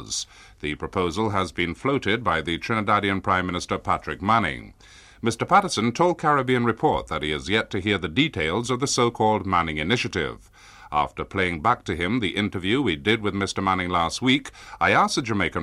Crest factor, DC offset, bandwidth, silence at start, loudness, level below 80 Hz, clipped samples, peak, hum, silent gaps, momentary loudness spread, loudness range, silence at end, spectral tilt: 18 dB; under 0.1%; 13.5 kHz; 0 s; -23 LUFS; -48 dBFS; under 0.1%; -6 dBFS; none; none; 8 LU; 2 LU; 0 s; -4.5 dB/octave